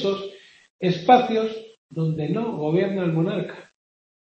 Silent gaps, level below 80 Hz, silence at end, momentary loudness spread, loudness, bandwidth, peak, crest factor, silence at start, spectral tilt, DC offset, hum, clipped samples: 0.70-0.79 s, 1.77-1.89 s; -66 dBFS; 0.6 s; 19 LU; -23 LUFS; 7.6 kHz; -2 dBFS; 20 dB; 0 s; -7.5 dB/octave; under 0.1%; none; under 0.1%